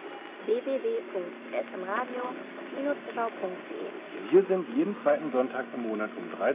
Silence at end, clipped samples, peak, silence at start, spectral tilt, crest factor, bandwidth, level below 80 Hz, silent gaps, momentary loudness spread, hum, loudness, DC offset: 0 s; under 0.1%; -10 dBFS; 0 s; -4.5 dB/octave; 20 dB; 3.9 kHz; under -90 dBFS; none; 13 LU; none; -31 LUFS; under 0.1%